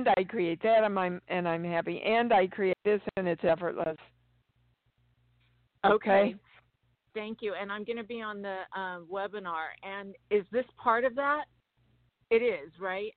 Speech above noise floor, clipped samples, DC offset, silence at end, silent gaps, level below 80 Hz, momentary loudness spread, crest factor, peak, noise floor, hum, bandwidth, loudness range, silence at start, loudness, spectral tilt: 43 dB; under 0.1%; under 0.1%; 0.05 s; none; -68 dBFS; 13 LU; 20 dB; -10 dBFS; -73 dBFS; none; 4.6 kHz; 8 LU; 0 s; -30 LUFS; -3.5 dB/octave